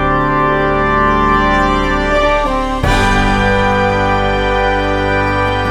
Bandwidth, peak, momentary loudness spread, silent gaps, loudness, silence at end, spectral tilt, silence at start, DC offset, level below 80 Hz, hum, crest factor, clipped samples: 13.5 kHz; 0 dBFS; 3 LU; none; -13 LUFS; 0 s; -6 dB/octave; 0 s; under 0.1%; -22 dBFS; none; 12 dB; under 0.1%